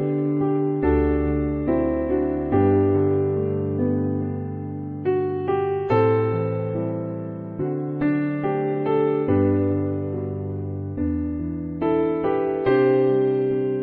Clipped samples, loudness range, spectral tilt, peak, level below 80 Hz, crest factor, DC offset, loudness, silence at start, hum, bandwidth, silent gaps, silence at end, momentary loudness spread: under 0.1%; 3 LU; -11.5 dB/octave; -6 dBFS; -40 dBFS; 16 dB; under 0.1%; -23 LUFS; 0 s; none; 4.5 kHz; none; 0 s; 10 LU